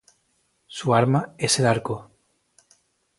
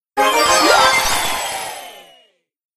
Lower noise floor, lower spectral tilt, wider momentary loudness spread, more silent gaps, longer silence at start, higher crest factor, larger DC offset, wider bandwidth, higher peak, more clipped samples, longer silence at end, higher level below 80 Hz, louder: first, -69 dBFS vs -56 dBFS; first, -4.5 dB/octave vs -0.5 dB/octave; about the same, 14 LU vs 16 LU; neither; first, 0.7 s vs 0.15 s; first, 22 dB vs 16 dB; neither; second, 11.5 kHz vs 15.5 kHz; second, -4 dBFS vs 0 dBFS; neither; first, 1.15 s vs 0.75 s; second, -60 dBFS vs -42 dBFS; second, -22 LUFS vs -14 LUFS